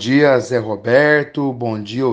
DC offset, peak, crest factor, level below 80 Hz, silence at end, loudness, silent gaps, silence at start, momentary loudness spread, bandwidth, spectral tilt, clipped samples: under 0.1%; 0 dBFS; 16 dB; -60 dBFS; 0 s; -16 LUFS; none; 0 s; 10 LU; 9.2 kHz; -6 dB/octave; under 0.1%